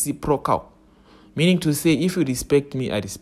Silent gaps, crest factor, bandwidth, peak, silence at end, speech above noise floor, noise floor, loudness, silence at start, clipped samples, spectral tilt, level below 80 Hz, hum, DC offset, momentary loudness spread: none; 16 dB; 14.5 kHz; -6 dBFS; 0 s; 30 dB; -51 dBFS; -21 LUFS; 0 s; under 0.1%; -5.5 dB/octave; -46 dBFS; none; under 0.1%; 7 LU